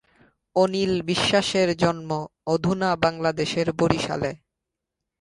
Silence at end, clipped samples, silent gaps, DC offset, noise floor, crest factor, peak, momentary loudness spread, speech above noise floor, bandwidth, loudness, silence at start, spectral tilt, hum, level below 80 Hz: 0.85 s; under 0.1%; none; under 0.1%; -84 dBFS; 24 dB; 0 dBFS; 8 LU; 61 dB; 11.5 kHz; -23 LUFS; 0.55 s; -5 dB/octave; none; -52 dBFS